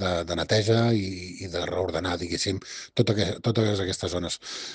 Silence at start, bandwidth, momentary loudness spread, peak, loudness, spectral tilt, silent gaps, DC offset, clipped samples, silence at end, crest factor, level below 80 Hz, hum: 0 s; 9.6 kHz; 10 LU; -8 dBFS; -26 LUFS; -5 dB/octave; none; under 0.1%; under 0.1%; 0 s; 18 dB; -52 dBFS; none